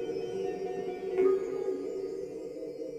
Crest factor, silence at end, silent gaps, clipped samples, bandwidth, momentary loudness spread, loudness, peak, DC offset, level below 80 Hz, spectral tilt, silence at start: 16 dB; 0 s; none; under 0.1%; 9 kHz; 12 LU; -33 LUFS; -16 dBFS; under 0.1%; -66 dBFS; -6.5 dB/octave; 0 s